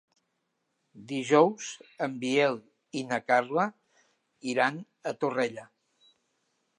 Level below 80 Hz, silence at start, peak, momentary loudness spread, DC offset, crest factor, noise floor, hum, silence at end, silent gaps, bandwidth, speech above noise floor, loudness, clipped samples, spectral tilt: -84 dBFS; 0.95 s; -8 dBFS; 16 LU; under 0.1%; 22 dB; -79 dBFS; none; 1.15 s; none; 11 kHz; 51 dB; -28 LUFS; under 0.1%; -4.5 dB/octave